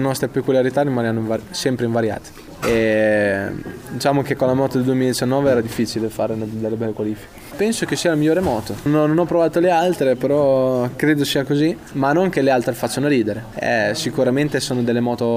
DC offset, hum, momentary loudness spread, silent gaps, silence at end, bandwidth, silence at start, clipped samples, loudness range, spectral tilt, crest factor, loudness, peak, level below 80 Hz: under 0.1%; none; 7 LU; none; 0 s; 16 kHz; 0 s; under 0.1%; 3 LU; -5.5 dB/octave; 14 dB; -19 LUFS; -4 dBFS; -48 dBFS